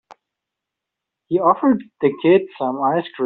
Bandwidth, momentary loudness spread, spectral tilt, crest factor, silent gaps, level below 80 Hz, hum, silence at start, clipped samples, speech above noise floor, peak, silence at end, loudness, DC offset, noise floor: 4.3 kHz; 6 LU; -5.5 dB/octave; 16 dB; none; -66 dBFS; none; 1.3 s; under 0.1%; 66 dB; -2 dBFS; 0 s; -18 LUFS; under 0.1%; -83 dBFS